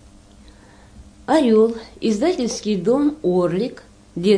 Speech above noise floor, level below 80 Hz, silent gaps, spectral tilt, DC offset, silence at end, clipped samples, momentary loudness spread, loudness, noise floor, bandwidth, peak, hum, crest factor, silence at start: 28 dB; -50 dBFS; none; -6 dB/octave; under 0.1%; 0 s; under 0.1%; 10 LU; -19 LUFS; -46 dBFS; 10.5 kHz; -4 dBFS; none; 16 dB; 0.95 s